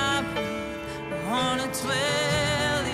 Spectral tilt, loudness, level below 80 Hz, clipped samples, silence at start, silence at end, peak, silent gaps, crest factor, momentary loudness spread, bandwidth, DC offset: -3.5 dB/octave; -26 LUFS; -50 dBFS; under 0.1%; 0 s; 0 s; -16 dBFS; none; 10 dB; 9 LU; 15.5 kHz; under 0.1%